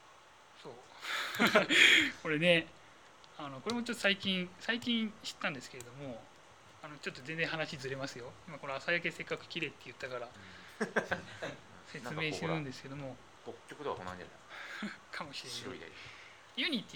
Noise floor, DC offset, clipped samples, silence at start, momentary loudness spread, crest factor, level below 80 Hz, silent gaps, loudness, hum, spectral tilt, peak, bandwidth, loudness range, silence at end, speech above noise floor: -59 dBFS; under 0.1%; under 0.1%; 0 s; 22 LU; 26 dB; -72 dBFS; none; -33 LUFS; none; -3.5 dB/octave; -10 dBFS; 19 kHz; 13 LU; 0 s; 24 dB